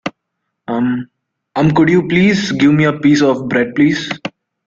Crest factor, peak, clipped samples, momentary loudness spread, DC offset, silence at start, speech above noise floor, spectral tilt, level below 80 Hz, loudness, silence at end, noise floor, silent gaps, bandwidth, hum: 14 dB; 0 dBFS; under 0.1%; 13 LU; under 0.1%; 0.05 s; 61 dB; -6.5 dB/octave; -50 dBFS; -13 LUFS; 0.35 s; -74 dBFS; none; 7.6 kHz; none